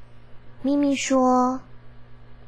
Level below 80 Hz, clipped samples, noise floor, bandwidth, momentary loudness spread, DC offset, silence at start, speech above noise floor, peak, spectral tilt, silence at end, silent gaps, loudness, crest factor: -54 dBFS; under 0.1%; -44 dBFS; 10 kHz; 10 LU; 0.7%; 0 s; 23 dB; -10 dBFS; -4 dB/octave; 0.1 s; none; -22 LUFS; 14 dB